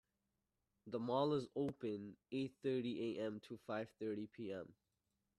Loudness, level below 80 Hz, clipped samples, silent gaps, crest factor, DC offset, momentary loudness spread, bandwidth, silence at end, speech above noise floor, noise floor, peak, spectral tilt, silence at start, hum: -44 LUFS; -82 dBFS; under 0.1%; none; 20 dB; under 0.1%; 10 LU; 12 kHz; 0.65 s; 45 dB; -89 dBFS; -26 dBFS; -7.5 dB/octave; 0.85 s; none